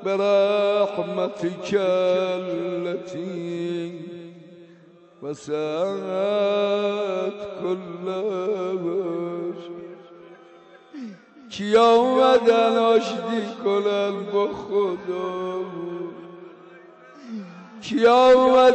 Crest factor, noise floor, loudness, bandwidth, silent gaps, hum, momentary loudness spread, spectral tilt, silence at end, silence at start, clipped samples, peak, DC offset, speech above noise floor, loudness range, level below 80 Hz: 14 dB; -51 dBFS; -22 LUFS; 8.4 kHz; none; none; 21 LU; -5.5 dB/octave; 0 s; 0 s; under 0.1%; -8 dBFS; under 0.1%; 29 dB; 10 LU; -64 dBFS